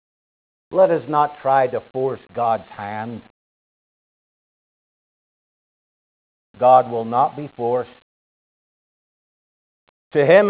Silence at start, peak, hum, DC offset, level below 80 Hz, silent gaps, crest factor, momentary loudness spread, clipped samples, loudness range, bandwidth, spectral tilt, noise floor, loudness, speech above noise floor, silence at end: 0.7 s; -2 dBFS; none; under 0.1%; -66 dBFS; 3.30-6.54 s, 8.02-10.11 s; 20 dB; 15 LU; under 0.1%; 9 LU; 4 kHz; -10 dB/octave; under -90 dBFS; -19 LUFS; over 72 dB; 0 s